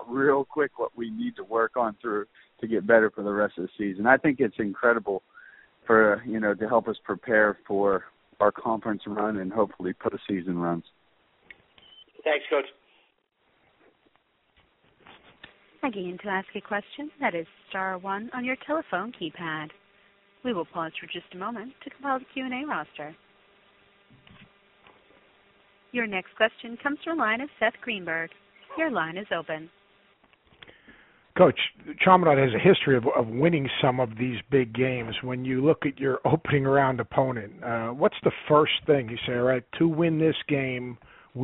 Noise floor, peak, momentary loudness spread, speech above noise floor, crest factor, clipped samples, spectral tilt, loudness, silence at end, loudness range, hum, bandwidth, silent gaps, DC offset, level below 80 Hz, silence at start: -69 dBFS; -2 dBFS; 13 LU; 44 dB; 24 dB; under 0.1%; -4 dB/octave; -26 LUFS; 0 s; 12 LU; none; 4 kHz; none; under 0.1%; -62 dBFS; 0 s